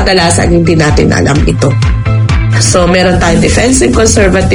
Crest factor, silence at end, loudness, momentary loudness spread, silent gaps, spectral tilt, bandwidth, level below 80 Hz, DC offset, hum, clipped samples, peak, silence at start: 6 dB; 0 s; -8 LUFS; 3 LU; none; -5 dB/octave; 11 kHz; -18 dBFS; under 0.1%; none; 0.9%; 0 dBFS; 0 s